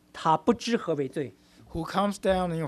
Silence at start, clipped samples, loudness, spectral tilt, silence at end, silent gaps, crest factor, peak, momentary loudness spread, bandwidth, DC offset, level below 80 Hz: 0.15 s; under 0.1%; -28 LUFS; -6 dB/octave; 0 s; none; 18 dB; -10 dBFS; 12 LU; 13.5 kHz; under 0.1%; -52 dBFS